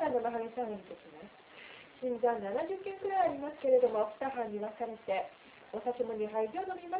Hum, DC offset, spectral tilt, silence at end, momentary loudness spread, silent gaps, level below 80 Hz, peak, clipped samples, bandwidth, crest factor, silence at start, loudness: none; under 0.1%; -4 dB/octave; 0 s; 20 LU; none; -74 dBFS; -18 dBFS; under 0.1%; 4 kHz; 18 dB; 0 s; -35 LUFS